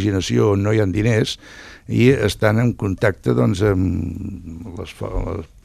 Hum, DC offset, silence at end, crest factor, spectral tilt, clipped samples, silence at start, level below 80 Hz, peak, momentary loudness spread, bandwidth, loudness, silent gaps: none; under 0.1%; 0.2 s; 18 dB; -6.5 dB/octave; under 0.1%; 0 s; -38 dBFS; 0 dBFS; 16 LU; 14 kHz; -19 LUFS; none